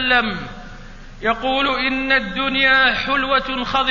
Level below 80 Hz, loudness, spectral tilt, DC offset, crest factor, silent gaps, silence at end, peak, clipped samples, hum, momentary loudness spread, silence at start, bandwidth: -38 dBFS; -17 LUFS; -4.5 dB/octave; under 0.1%; 16 dB; none; 0 s; -4 dBFS; under 0.1%; none; 11 LU; 0 s; 7.4 kHz